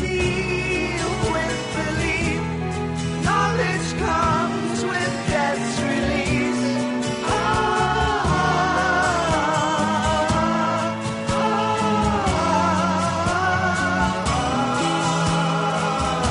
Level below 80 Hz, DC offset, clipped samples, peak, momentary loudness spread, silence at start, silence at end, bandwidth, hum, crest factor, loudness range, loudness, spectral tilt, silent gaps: -36 dBFS; under 0.1%; under 0.1%; -8 dBFS; 4 LU; 0 s; 0 s; 11 kHz; none; 14 dB; 2 LU; -21 LUFS; -5 dB/octave; none